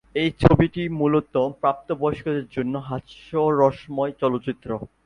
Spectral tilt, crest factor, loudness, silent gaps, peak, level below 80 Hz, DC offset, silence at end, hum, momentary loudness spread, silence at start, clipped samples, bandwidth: -8.5 dB/octave; 22 dB; -23 LUFS; none; 0 dBFS; -44 dBFS; under 0.1%; 0.2 s; none; 11 LU; 0.15 s; under 0.1%; 10.5 kHz